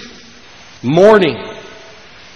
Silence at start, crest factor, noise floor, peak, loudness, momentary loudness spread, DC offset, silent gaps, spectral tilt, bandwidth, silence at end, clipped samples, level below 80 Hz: 0 s; 14 dB; -39 dBFS; 0 dBFS; -11 LUFS; 24 LU; under 0.1%; none; -6.5 dB/octave; 9.2 kHz; 0.75 s; 0.2%; -50 dBFS